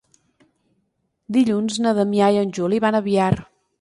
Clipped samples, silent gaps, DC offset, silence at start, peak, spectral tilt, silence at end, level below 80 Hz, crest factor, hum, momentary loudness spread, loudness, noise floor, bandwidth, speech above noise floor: under 0.1%; none; under 0.1%; 1.3 s; -4 dBFS; -6 dB/octave; 0.4 s; -54 dBFS; 16 dB; none; 4 LU; -19 LUFS; -71 dBFS; 11.5 kHz; 52 dB